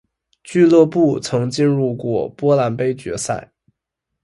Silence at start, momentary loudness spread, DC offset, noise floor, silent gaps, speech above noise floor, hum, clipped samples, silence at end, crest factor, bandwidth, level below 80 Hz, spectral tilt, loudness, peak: 0.45 s; 11 LU; under 0.1%; -79 dBFS; none; 63 dB; none; under 0.1%; 0.8 s; 16 dB; 11.5 kHz; -56 dBFS; -6.5 dB/octave; -17 LUFS; 0 dBFS